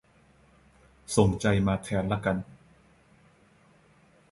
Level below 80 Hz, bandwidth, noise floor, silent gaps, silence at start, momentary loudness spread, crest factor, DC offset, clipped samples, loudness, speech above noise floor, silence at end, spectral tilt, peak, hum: -48 dBFS; 11.5 kHz; -61 dBFS; none; 1.1 s; 14 LU; 24 dB; under 0.1%; under 0.1%; -27 LUFS; 35 dB; 1.8 s; -6 dB/octave; -8 dBFS; none